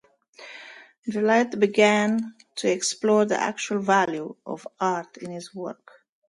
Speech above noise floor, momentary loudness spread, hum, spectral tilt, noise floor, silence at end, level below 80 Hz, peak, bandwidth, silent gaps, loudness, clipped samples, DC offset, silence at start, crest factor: 24 dB; 18 LU; none; -4 dB/octave; -48 dBFS; 0.55 s; -74 dBFS; -4 dBFS; 11.5 kHz; 0.98-1.03 s; -23 LUFS; under 0.1%; under 0.1%; 0.4 s; 20 dB